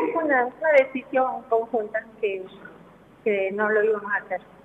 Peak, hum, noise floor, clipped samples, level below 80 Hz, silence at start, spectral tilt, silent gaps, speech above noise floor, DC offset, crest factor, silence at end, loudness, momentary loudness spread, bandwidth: -6 dBFS; none; -50 dBFS; under 0.1%; -68 dBFS; 0 s; -6.5 dB/octave; none; 26 dB; under 0.1%; 18 dB; 0.25 s; -24 LUFS; 11 LU; 6.6 kHz